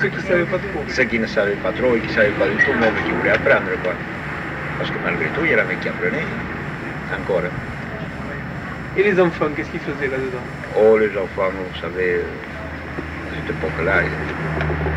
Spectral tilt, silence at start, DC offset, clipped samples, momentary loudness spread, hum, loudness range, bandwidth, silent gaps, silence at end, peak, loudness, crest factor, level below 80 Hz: -6.5 dB/octave; 0 s; under 0.1%; under 0.1%; 12 LU; none; 5 LU; 11 kHz; none; 0 s; -4 dBFS; -20 LUFS; 16 dB; -38 dBFS